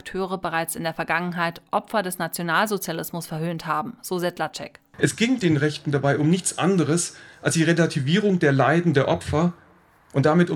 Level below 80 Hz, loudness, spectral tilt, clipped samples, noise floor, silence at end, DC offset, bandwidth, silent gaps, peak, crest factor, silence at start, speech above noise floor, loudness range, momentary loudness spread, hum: -56 dBFS; -23 LUFS; -5 dB/octave; under 0.1%; -55 dBFS; 0 s; under 0.1%; 18.5 kHz; none; -4 dBFS; 20 dB; 0.05 s; 32 dB; 5 LU; 10 LU; none